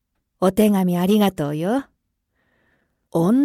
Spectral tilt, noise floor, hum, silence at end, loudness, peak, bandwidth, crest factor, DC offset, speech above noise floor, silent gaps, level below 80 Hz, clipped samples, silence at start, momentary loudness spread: -7 dB/octave; -71 dBFS; none; 0 s; -20 LUFS; -4 dBFS; 16 kHz; 16 dB; under 0.1%; 54 dB; none; -54 dBFS; under 0.1%; 0.4 s; 7 LU